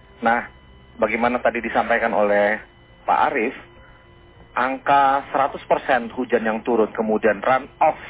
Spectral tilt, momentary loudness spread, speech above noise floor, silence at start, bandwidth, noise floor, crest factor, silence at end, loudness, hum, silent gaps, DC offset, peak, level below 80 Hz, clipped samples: -8.5 dB/octave; 6 LU; 28 dB; 0.2 s; 4 kHz; -48 dBFS; 16 dB; 0 s; -20 LUFS; none; none; under 0.1%; -6 dBFS; -52 dBFS; under 0.1%